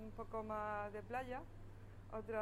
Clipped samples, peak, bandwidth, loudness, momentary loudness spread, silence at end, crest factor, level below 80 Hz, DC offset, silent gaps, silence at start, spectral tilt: under 0.1%; -30 dBFS; 16 kHz; -46 LUFS; 15 LU; 0 s; 16 dB; -58 dBFS; under 0.1%; none; 0 s; -7 dB/octave